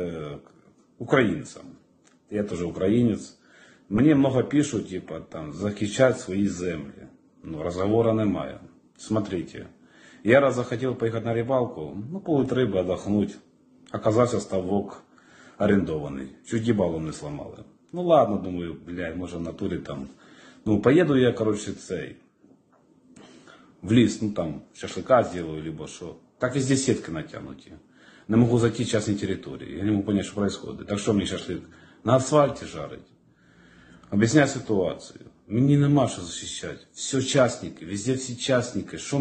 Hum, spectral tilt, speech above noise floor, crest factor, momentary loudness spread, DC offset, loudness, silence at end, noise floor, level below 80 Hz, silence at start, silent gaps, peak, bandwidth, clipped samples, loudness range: none; -6 dB/octave; 35 dB; 22 dB; 17 LU; under 0.1%; -25 LUFS; 0 s; -60 dBFS; -56 dBFS; 0 s; none; -4 dBFS; 9.4 kHz; under 0.1%; 3 LU